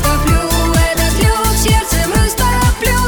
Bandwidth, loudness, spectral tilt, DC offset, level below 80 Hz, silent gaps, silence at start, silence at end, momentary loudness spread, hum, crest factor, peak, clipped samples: over 20 kHz; -13 LUFS; -4 dB/octave; 0.4%; -16 dBFS; none; 0 s; 0 s; 1 LU; none; 12 dB; 0 dBFS; under 0.1%